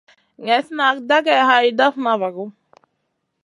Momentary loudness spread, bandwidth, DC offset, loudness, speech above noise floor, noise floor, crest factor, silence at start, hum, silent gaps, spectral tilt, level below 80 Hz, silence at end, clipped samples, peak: 16 LU; 11.5 kHz; under 0.1%; -17 LUFS; 56 dB; -73 dBFS; 18 dB; 0.4 s; none; none; -4 dB/octave; -78 dBFS; 0.95 s; under 0.1%; -2 dBFS